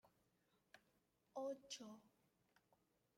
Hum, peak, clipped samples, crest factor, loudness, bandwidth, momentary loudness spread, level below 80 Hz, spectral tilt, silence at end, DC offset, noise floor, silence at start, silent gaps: none; -38 dBFS; under 0.1%; 20 dB; -53 LUFS; 16 kHz; 11 LU; under -90 dBFS; -2.5 dB/octave; 1.1 s; under 0.1%; -83 dBFS; 0.05 s; none